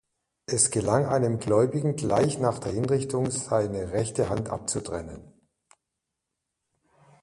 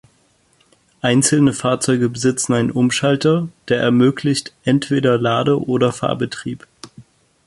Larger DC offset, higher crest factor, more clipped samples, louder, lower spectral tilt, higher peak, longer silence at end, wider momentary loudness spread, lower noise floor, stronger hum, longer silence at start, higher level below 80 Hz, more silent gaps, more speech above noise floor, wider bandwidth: neither; first, 20 dB vs 14 dB; neither; second, -26 LUFS vs -17 LUFS; about the same, -5 dB/octave vs -5 dB/octave; second, -8 dBFS vs -2 dBFS; first, 1.95 s vs 0.45 s; about the same, 8 LU vs 7 LU; first, -84 dBFS vs -58 dBFS; neither; second, 0.5 s vs 1.05 s; about the same, -52 dBFS vs -54 dBFS; neither; first, 58 dB vs 42 dB; about the same, 11.5 kHz vs 11.5 kHz